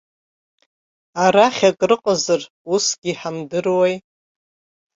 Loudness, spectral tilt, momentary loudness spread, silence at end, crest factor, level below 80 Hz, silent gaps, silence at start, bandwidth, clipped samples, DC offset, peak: -18 LUFS; -3.5 dB/octave; 11 LU; 0.95 s; 18 dB; -64 dBFS; 2.50-2.65 s, 2.98-3.02 s; 1.15 s; 8 kHz; under 0.1%; under 0.1%; -2 dBFS